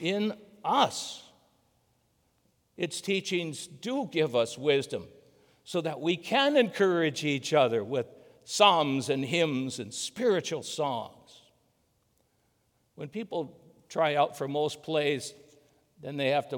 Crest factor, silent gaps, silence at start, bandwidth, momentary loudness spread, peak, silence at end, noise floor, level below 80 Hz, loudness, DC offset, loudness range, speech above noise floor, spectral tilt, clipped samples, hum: 24 dB; none; 0 s; 19.5 kHz; 13 LU; -6 dBFS; 0 s; -72 dBFS; -78 dBFS; -29 LUFS; under 0.1%; 9 LU; 43 dB; -4 dB/octave; under 0.1%; none